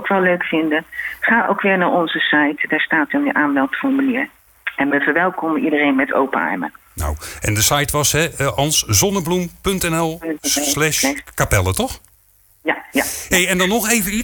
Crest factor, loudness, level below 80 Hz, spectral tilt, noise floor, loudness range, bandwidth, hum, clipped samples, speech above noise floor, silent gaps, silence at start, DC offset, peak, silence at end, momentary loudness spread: 16 dB; -17 LUFS; -38 dBFS; -3.5 dB/octave; -54 dBFS; 2 LU; 19.5 kHz; none; under 0.1%; 36 dB; none; 0 s; under 0.1%; -2 dBFS; 0 s; 8 LU